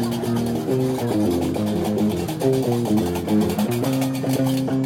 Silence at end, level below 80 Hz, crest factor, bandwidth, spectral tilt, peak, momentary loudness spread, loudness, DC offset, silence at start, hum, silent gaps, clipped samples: 0 s; -52 dBFS; 14 dB; 17 kHz; -6.5 dB/octave; -8 dBFS; 2 LU; -22 LUFS; under 0.1%; 0 s; none; none; under 0.1%